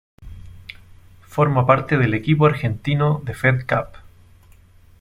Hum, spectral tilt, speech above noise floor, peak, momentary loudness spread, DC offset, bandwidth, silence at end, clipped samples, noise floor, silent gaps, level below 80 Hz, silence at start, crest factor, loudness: none; -8 dB/octave; 31 dB; -2 dBFS; 22 LU; under 0.1%; 11.5 kHz; 1.05 s; under 0.1%; -49 dBFS; none; -46 dBFS; 0.2 s; 20 dB; -19 LUFS